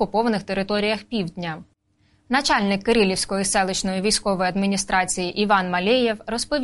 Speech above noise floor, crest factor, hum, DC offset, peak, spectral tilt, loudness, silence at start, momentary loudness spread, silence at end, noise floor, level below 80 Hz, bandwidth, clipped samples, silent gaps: 41 dB; 16 dB; none; under 0.1%; -6 dBFS; -3.5 dB/octave; -21 LUFS; 0 s; 7 LU; 0 s; -62 dBFS; -46 dBFS; 11.5 kHz; under 0.1%; none